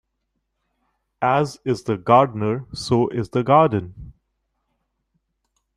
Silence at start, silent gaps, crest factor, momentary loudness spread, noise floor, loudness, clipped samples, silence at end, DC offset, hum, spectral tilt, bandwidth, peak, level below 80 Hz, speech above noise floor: 1.2 s; none; 20 dB; 10 LU; -75 dBFS; -20 LUFS; under 0.1%; 1.65 s; under 0.1%; none; -7 dB/octave; 12.5 kHz; -2 dBFS; -52 dBFS; 56 dB